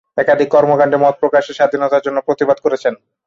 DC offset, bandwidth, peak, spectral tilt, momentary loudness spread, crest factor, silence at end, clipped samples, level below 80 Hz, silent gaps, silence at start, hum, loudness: under 0.1%; 7.4 kHz; -2 dBFS; -6 dB/octave; 6 LU; 12 dB; 0.3 s; under 0.1%; -60 dBFS; none; 0.15 s; none; -14 LUFS